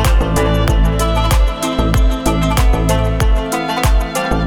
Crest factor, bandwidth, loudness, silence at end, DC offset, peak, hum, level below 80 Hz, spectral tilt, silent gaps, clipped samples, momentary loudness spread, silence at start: 12 dB; 19 kHz; -15 LUFS; 0 s; under 0.1%; 0 dBFS; none; -16 dBFS; -5.5 dB/octave; none; under 0.1%; 3 LU; 0 s